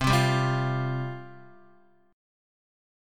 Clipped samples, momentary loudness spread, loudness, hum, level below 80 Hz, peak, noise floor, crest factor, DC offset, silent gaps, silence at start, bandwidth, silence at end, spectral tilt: under 0.1%; 18 LU; -27 LUFS; none; -48 dBFS; -10 dBFS; -60 dBFS; 20 dB; under 0.1%; none; 0 s; 15.5 kHz; 0.95 s; -5.5 dB/octave